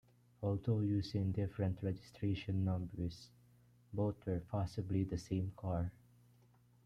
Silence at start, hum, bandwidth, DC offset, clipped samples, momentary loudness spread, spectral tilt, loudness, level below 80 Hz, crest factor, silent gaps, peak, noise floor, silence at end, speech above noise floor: 0.4 s; 60 Hz at -60 dBFS; 9.4 kHz; under 0.1%; under 0.1%; 7 LU; -8.5 dB/octave; -40 LUFS; -62 dBFS; 14 dB; none; -24 dBFS; -68 dBFS; 0.95 s; 30 dB